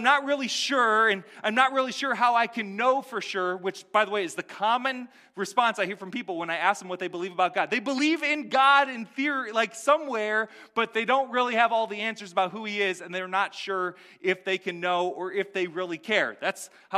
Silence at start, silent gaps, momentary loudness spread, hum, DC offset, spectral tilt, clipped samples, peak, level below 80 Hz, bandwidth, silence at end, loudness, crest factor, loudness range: 0 s; none; 9 LU; none; under 0.1%; -3 dB/octave; under 0.1%; -6 dBFS; -86 dBFS; 15 kHz; 0 s; -26 LUFS; 20 dB; 4 LU